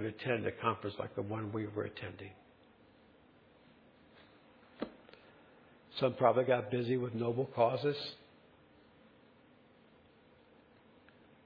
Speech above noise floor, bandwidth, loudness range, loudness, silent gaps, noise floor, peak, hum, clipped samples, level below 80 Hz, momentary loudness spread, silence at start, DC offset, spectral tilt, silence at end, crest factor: 29 dB; 5.2 kHz; 19 LU; -36 LUFS; none; -64 dBFS; -14 dBFS; none; under 0.1%; -76 dBFS; 16 LU; 0 s; under 0.1%; -5 dB/octave; 3.3 s; 24 dB